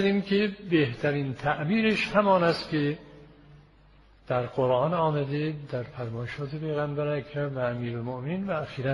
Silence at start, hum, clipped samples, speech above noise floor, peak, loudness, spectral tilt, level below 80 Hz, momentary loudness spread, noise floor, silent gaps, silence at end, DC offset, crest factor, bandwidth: 0 s; none; under 0.1%; 29 dB; -8 dBFS; -28 LUFS; -7.5 dB/octave; -58 dBFS; 11 LU; -56 dBFS; none; 0 s; under 0.1%; 20 dB; 11.5 kHz